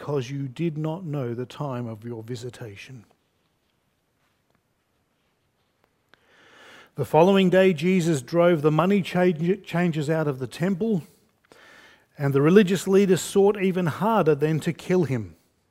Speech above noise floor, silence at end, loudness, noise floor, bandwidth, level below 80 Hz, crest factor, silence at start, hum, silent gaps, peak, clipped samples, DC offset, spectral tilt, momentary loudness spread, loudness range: 48 dB; 0.4 s; -23 LUFS; -71 dBFS; 16 kHz; -64 dBFS; 20 dB; 0 s; none; none; -4 dBFS; under 0.1%; under 0.1%; -6.5 dB/octave; 17 LU; 15 LU